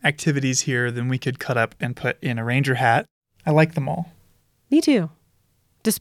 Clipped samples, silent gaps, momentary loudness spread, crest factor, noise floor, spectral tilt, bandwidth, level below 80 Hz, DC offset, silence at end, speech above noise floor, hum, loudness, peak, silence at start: under 0.1%; 3.11-3.21 s; 9 LU; 18 dB; -64 dBFS; -5 dB/octave; 16.5 kHz; -62 dBFS; under 0.1%; 0 s; 43 dB; none; -22 LUFS; -4 dBFS; 0.05 s